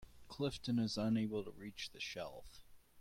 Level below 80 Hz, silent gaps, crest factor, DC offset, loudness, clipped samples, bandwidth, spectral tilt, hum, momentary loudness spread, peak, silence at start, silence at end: -64 dBFS; none; 14 dB; under 0.1%; -41 LUFS; under 0.1%; 15.5 kHz; -5.5 dB/octave; none; 13 LU; -28 dBFS; 0 s; 0 s